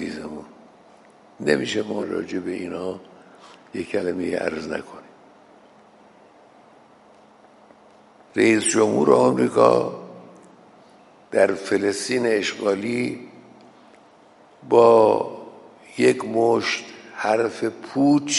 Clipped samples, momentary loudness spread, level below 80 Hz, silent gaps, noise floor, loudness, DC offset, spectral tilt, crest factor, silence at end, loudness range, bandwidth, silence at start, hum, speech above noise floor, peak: under 0.1%; 18 LU; -66 dBFS; none; -52 dBFS; -21 LUFS; under 0.1%; -4.5 dB/octave; 22 dB; 0 s; 10 LU; 11.5 kHz; 0 s; none; 32 dB; 0 dBFS